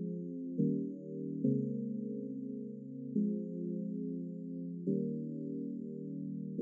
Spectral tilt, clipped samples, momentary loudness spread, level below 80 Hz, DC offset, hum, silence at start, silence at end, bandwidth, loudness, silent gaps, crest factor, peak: -17.5 dB/octave; under 0.1%; 8 LU; under -90 dBFS; under 0.1%; none; 0 s; 0 s; 0.7 kHz; -39 LUFS; none; 18 dB; -20 dBFS